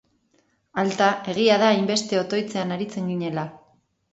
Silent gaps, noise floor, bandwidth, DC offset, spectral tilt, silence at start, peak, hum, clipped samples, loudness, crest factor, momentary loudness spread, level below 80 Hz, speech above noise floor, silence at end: none; -66 dBFS; 8.2 kHz; under 0.1%; -4.5 dB/octave; 0.75 s; -6 dBFS; none; under 0.1%; -23 LUFS; 18 dB; 11 LU; -68 dBFS; 44 dB; 0.55 s